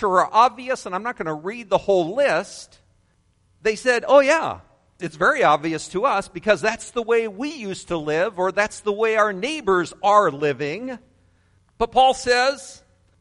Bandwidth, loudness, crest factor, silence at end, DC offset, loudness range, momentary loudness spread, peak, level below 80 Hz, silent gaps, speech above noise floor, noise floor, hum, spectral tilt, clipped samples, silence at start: 11.5 kHz; -20 LUFS; 18 dB; 0.45 s; under 0.1%; 3 LU; 13 LU; -2 dBFS; -54 dBFS; none; 42 dB; -62 dBFS; none; -4 dB/octave; under 0.1%; 0 s